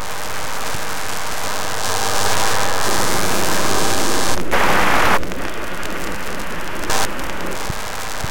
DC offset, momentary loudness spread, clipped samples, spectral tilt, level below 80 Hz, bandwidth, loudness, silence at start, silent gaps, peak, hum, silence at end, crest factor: 10%; 10 LU; under 0.1%; -2.5 dB/octave; -36 dBFS; 17.5 kHz; -20 LUFS; 0 s; none; 0 dBFS; none; 0 s; 20 dB